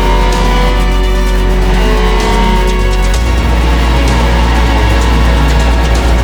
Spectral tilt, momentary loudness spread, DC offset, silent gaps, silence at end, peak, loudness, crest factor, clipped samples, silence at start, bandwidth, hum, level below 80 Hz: -5.5 dB/octave; 2 LU; under 0.1%; none; 0 s; 0 dBFS; -11 LUFS; 8 dB; under 0.1%; 0 s; 18.5 kHz; none; -10 dBFS